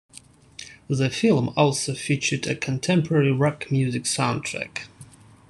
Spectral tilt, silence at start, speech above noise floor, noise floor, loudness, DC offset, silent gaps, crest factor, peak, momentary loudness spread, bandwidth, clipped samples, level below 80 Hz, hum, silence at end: -5 dB/octave; 0.15 s; 27 dB; -49 dBFS; -23 LUFS; under 0.1%; none; 18 dB; -6 dBFS; 14 LU; 12.5 kHz; under 0.1%; -60 dBFS; none; 0.45 s